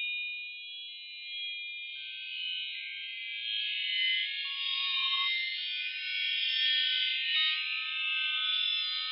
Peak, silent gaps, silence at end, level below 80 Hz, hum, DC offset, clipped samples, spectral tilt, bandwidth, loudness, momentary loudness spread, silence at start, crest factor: -16 dBFS; none; 0 s; under -90 dBFS; none; under 0.1%; under 0.1%; 16.5 dB/octave; 5.6 kHz; -30 LUFS; 12 LU; 0 s; 16 dB